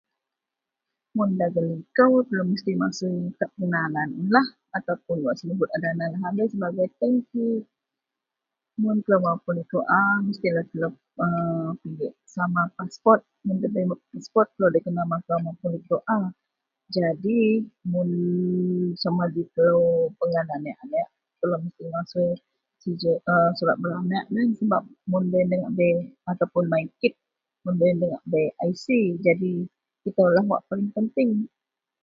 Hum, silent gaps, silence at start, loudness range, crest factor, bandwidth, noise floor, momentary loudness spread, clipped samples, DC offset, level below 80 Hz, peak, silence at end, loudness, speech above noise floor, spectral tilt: none; none; 1.15 s; 3 LU; 22 dB; 7.4 kHz; -87 dBFS; 10 LU; under 0.1%; under 0.1%; -68 dBFS; -2 dBFS; 0.55 s; -24 LUFS; 63 dB; -8 dB/octave